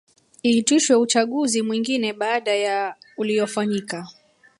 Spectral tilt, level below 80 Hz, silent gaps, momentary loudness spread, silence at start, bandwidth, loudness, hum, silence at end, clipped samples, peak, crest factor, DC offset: -3 dB/octave; -70 dBFS; none; 12 LU; 0.45 s; 11.5 kHz; -21 LUFS; none; 0.5 s; under 0.1%; -6 dBFS; 16 dB; under 0.1%